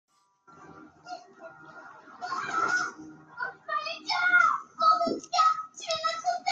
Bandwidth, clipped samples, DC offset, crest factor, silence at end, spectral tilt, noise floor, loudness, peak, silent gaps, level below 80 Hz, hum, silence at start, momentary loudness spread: 9 kHz; under 0.1%; under 0.1%; 18 dB; 0 s; -1.5 dB/octave; -59 dBFS; -27 LUFS; -12 dBFS; none; -78 dBFS; none; 0.6 s; 24 LU